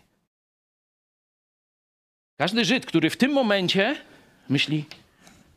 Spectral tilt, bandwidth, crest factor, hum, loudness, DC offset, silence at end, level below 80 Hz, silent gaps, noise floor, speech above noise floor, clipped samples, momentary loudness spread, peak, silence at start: -5 dB/octave; 15 kHz; 20 dB; none; -23 LUFS; under 0.1%; 0.65 s; -70 dBFS; none; -55 dBFS; 32 dB; under 0.1%; 8 LU; -6 dBFS; 2.4 s